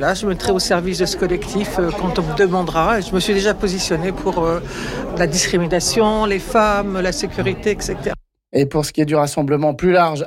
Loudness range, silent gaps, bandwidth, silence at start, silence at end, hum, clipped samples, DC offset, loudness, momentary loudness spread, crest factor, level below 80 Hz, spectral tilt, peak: 1 LU; none; 16.5 kHz; 0 s; 0 s; none; under 0.1%; under 0.1%; -18 LUFS; 6 LU; 12 dB; -34 dBFS; -4.5 dB/octave; -6 dBFS